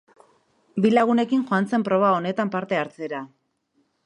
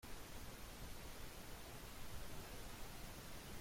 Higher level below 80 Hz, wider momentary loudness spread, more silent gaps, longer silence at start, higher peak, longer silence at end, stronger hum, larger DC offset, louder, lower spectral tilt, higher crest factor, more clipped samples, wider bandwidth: second, -72 dBFS vs -58 dBFS; first, 13 LU vs 1 LU; neither; first, 0.75 s vs 0 s; first, -6 dBFS vs -38 dBFS; first, 0.8 s vs 0 s; neither; neither; first, -22 LUFS vs -54 LUFS; first, -7 dB/octave vs -3.5 dB/octave; about the same, 18 dB vs 14 dB; neither; second, 10.5 kHz vs 16.5 kHz